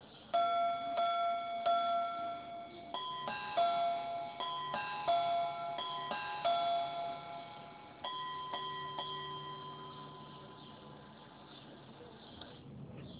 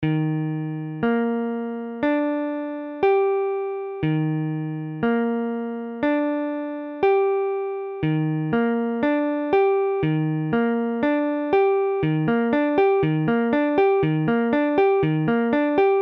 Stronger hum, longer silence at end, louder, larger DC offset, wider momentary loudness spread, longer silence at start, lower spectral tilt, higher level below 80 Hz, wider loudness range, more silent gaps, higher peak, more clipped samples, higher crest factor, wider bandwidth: neither; about the same, 0 s vs 0 s; second, -37 LUFS vs -22 LUFS; neither; first, 19 LU vs 8 LU; about the same, 0 s vs 0 s; second, -1.5 dB/octave vs -10 dB/octave; second, -74 dBFS vs -56 dBFS; first, 12 LU vs 4 LU; neither; second, -22 dBFS vs -8 dBFS; neither; about the same, 16 dB vs 14 dB; second, 4 kHz vs 5.4 kHz